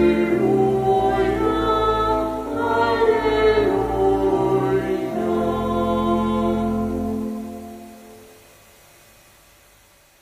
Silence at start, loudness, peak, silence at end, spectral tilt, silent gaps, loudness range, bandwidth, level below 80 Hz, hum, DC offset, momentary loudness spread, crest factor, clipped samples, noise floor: 0 s; -20 LUFS; -6 dBFS; 1.95 s; -7 dB/octave; none; 9 LU; 15.5 kHz; -38 dBFS; none; under 0.1%; 8 LU; 14 dB; under 0.1%; -53 dBFS